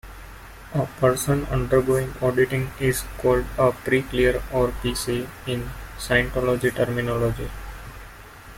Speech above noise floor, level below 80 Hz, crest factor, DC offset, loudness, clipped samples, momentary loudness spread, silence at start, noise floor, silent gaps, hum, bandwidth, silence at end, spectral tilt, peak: 20 dB; -38 dBFS; 18 dB; under 0.1%; -23 LUFS; under 0.1%; 19 LU; 0.05 s; -43 dBFS; none; none; 16.5 kHz; 0 s; -5.5 dB/octave; -6 dBFS